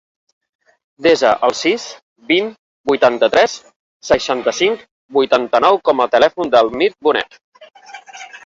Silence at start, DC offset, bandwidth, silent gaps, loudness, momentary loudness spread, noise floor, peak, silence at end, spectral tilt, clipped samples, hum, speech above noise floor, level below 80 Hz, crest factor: 1 s; under 0.1%; 8 kHz; 2.02-2.16 s, 2.59-2.84 s, 3.76-4.00 s, 4.91-5.09 s, 7.44-7.52 s; -15 LUFS; 16 LU; -36 dBFS; -2 dBFS; 0.1 s; -3 dB/octave; under 0.1%; none; 21 dB; -54 dBFS; 16 dB